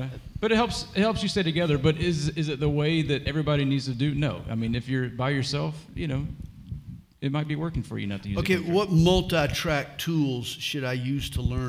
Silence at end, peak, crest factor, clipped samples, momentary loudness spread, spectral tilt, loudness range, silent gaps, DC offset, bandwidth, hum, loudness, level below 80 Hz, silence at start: 0 s; -8 dBFS; 18 dB; under 0.1%; 9 LU; -6 dB/octave; 5 LU; none; under 0.1%; 16 kHz; none; -26 LUFS; -42 dBFS; 0 s